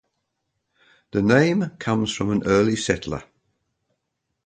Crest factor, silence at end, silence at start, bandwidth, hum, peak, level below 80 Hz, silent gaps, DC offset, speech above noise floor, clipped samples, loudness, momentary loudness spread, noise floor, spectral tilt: 20 dB; 1.25 s; 1.15 s; 9.4 kHz; none; -4 dBFS; -50 dBFS; none; under 0.1%; 58 dB; under 0.1%; -21 LUFS; 10 LU; -78 dBFS; -5.5 dB/octave